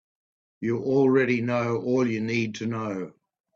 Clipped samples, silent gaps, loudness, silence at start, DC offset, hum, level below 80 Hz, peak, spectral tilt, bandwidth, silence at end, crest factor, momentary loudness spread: under 0.1%; none; -25 LUFS; 0.6 s; under 0.1%; none; -68 dBFS; -10 dBFS; -7 dB/octave; 7.4 kHz; 0.45 s; 16 dB; 12 LU